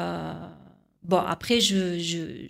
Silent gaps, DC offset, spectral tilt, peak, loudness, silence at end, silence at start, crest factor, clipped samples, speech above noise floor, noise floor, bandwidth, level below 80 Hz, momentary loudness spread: none; under 0.1%; -4 dB/octave; -8 dBFS; -25 LUFS; 0 s; 0 s; 20 dB; under 0.1%; 29 dB; -54 dBFS; 16 kHz; -58 dBFS; 20 LU